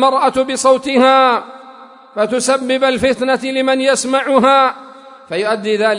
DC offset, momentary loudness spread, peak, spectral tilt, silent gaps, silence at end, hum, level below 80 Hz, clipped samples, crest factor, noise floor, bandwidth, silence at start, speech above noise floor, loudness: under 0.1%; 10 LU; 0 dBFS; -3 dB/octave; none; 0 s; none; -54 dBFS; under 0.1%; 14 dB; -38 dBFS; 11 kHz; 0 s; 25 dB; -14 LUFS